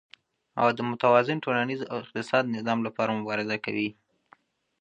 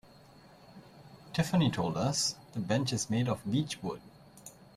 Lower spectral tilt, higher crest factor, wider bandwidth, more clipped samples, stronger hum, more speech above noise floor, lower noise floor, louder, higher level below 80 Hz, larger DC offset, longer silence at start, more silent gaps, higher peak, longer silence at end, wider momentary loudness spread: first, -6.5 dB/octave vs -5 dB/octave; about the same, 22 dB vs 18 dB; second, 9.6 kHz vs 15 kHz; neither; neither; first, 35 dB vs 25 dB; first, -61 dBFS vs -57 dBFS; first, -27 LUFS vs -32 LUFS; second, -74 dBFS vs -62 dBFS; neither; second, 0.55 s vs 0.7 s; neither; first, -6 dBFS vs -16 dBFS; first, 0.9 s vs 0.25 s; second, 11 LU vs 16 LU